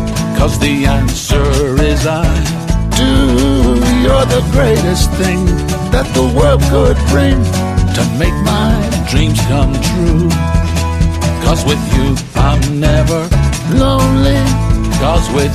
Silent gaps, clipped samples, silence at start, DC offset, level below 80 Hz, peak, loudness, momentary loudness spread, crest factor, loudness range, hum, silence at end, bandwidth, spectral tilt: none; under 0.1%; 0 s; under 0.1%; -16 dBFS; 0 dBFS; -12 LUFS; 4 LU; 10 dB; 1 LU; none; 0 s; 15.5 kHz; -5.5 dB/octave